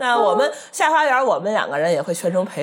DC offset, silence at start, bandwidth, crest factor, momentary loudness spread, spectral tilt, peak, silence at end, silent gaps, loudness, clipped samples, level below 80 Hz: under 0.1%; 0 s; 17 kHz; 16 dB; 5 LU; -3.5 dB/octave; -4 dBFS; 0 s; none; -19 LUFS; under 0.1%; -84 dBFS